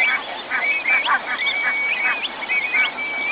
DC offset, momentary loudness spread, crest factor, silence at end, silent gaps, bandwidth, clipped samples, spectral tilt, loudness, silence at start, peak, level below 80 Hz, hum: under 0.1%; 6 LU; 14 dB; 0 s; none; 4 kHz; under 0.1%; 3 dB/octave; -19 LUFS; 0 s; -8 dBFS; -64 dBFS; none